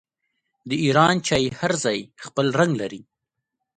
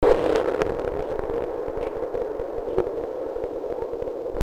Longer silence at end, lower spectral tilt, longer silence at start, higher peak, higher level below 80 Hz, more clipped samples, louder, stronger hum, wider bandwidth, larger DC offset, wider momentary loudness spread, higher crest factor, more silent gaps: first, 0.8 s vs 0 s; second, -4.5 dB/octave vs -6.5 dB/octave; first, 0.65 s vs 0 s; about the same, 0 dBFS vs -2 dBFS; second, -56 dBFS vs -40 dBFS; neither; first, -21 LUFS vs -27 LUFS; neither; second, 11 kHz vs 13 kHz; neither; first, 12 LU vs 7 LU; about the same, 22 dB vs 22 dB; neither